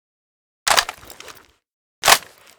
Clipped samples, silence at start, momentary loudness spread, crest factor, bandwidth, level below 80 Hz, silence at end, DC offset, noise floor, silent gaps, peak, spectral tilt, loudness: under 0.1%; 0.65 s; 24 LU; 22 dB; over 20 kHz; -52 dBFS; 0.4 s; under 0.1%; -45 dBFS; 1.73-2.02 s; 0 dBFS; 1 dB/octave; -17 LUFS